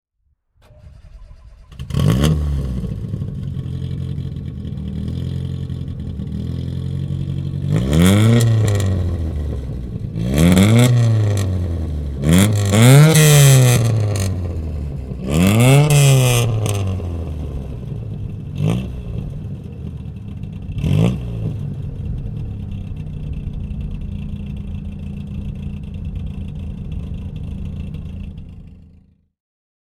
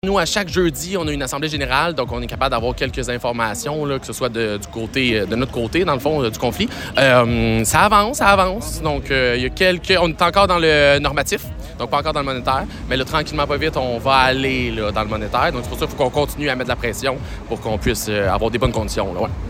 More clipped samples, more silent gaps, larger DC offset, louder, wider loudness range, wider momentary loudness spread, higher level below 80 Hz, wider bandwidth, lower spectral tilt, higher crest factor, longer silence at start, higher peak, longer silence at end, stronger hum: neither; neither; neither; about the same, -18 LUFS vs -18 LUFS; first, 16 LU vs 5 LU; first, 17 LU vs 9 LU; about the same, -30 dBFS vs -32 dBFS; about the same, 17.5 kHz vs 16.5 kHz; about the same, -5.5 dB/octave vs -4.5 dB/octave; about the same, 16 dB vs 18 dB; first, 0.85 s vs 0.05 s; about the same, -2 dBFS vs 0 dBFS; first, 1.2 s vs 0 s; neither